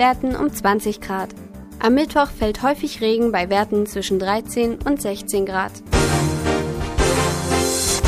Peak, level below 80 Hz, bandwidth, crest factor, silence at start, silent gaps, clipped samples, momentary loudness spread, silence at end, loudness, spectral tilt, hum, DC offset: -4 dBFS; -32 dBFS; 15.5 kHz; 16 dB; 0 s; none; under 0.1%; 7 LU; 0 s; -20 LUFS; -4.5 dB/octave; none; under 0.1%